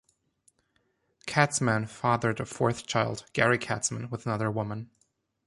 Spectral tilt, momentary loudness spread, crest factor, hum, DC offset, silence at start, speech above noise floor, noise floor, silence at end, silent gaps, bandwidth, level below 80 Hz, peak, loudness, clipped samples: -4.5 dB/octave; 10 LU; 22 dB; none; under 0.1%; 1.25 s; 45 dB; -73 dBFS; 0.6 s; none; 11.5 kHz; -62 dBFS; -8 dBFS; -28 LUFS; under 0.1%